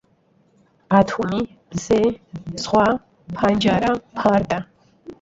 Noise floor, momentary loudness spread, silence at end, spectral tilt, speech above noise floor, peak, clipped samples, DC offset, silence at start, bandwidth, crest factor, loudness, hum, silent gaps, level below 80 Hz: -60 dBFS; 13 LU; 0.1 s; -6 dB/octave; 41 dB; -2 dBFS; under 0.1%; under 0.1%; 0.9 s; 8 kHz; 18 dB; -20 LUFS; none; none; -48 dBFS